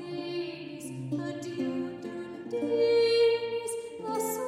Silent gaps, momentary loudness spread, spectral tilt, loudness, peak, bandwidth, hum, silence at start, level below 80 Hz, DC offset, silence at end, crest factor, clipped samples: none; 15 LU; -4.5 dB/octave; -30 LUFS; -16 dBFS; 15.5 kHz; none; 0 s; -74 dBFS; under 0.1%; 0 s; 14 dB; under 0.1%